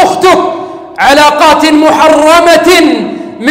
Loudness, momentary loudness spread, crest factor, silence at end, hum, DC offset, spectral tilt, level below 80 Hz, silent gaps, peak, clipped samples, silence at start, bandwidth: -5 LUFS; 11 LU; 6 dB; 0 s; none; under 0.1%; -3 dB/octave; -38 dBFS; none; 0 dBFS; 1%; 0 s; 16.5 kHz